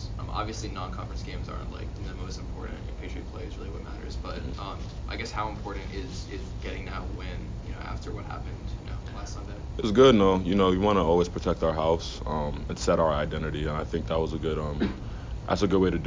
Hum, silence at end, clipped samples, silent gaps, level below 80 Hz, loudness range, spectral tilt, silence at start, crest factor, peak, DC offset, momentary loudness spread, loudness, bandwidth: none; 0 s; under 0.1%; none; -38 dBFS; 13 LU; -6.5 dB/octave; 0 s; 22 dB; -6 dBFS; under 0.1%; 15 LU; -29 LUFS; 7.6 kHz